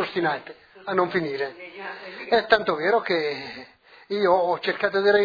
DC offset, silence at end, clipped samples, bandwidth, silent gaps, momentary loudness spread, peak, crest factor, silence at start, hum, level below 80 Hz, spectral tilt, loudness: under 0.1%; 0 s; under 0.1%; 5 kHz; none; 16 LU; -2 dBFS; 22 dB; 0 s; none; -64 dBFS; -6 dB/octave; -23 LUFS